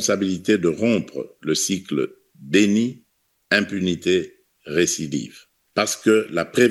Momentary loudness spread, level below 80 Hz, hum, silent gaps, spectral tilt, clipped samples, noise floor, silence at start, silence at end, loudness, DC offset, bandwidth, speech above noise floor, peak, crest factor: 10 LU; -62 dBFS; none; none; -4 dB/octave; under 0.1%; -66 dBFS; 0 s; 0 s; -21 LUFS; under 0.1%; 12.5 kHz; 45 dB; 0 dBFS; 20 dB